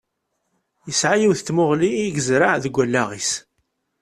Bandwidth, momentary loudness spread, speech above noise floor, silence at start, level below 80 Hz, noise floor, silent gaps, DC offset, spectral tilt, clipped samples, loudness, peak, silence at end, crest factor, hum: 13 kHz; 7 LU; 55 dB; 0.85 s; -58 dBFS; -74 dBFS; none; under 0.1%; -4 dB/octave; under 0.1%; -19 LUFS; -2 dBFS; 0.6 s; 18 dB; none